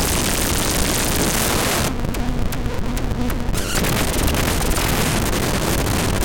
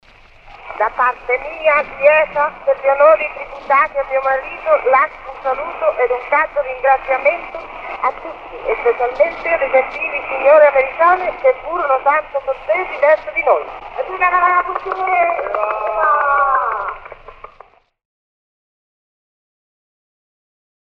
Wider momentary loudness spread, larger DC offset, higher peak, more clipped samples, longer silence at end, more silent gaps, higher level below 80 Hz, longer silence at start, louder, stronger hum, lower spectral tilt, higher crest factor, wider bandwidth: second, 7 LU vs 11 LU; neither; second, -8 dBFS vs 0 dBFS; neither; second, 0 s vs 3.5 s; neither; first, -24 dBFS vs -46 dBFS; second, 0 s vs 0.45 s; second, -20 LUFS vs -16 LUFS; neither; second, -3.5 dB/octave vs -5.5 dB/octave; about the same, 12 dB vs 16 dB; first, 17.5 kHz vs 5.6 kHz